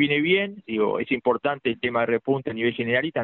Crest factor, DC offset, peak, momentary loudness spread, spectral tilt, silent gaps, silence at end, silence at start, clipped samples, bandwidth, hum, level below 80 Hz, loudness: 16 dB; under 0.1%; -8 dBFS; 5 LU; -3.5 dB/octave; none; 0 s; 0 s; under 0.1%; 4.3 kHz; none; -62 dBFS; -24 LUFS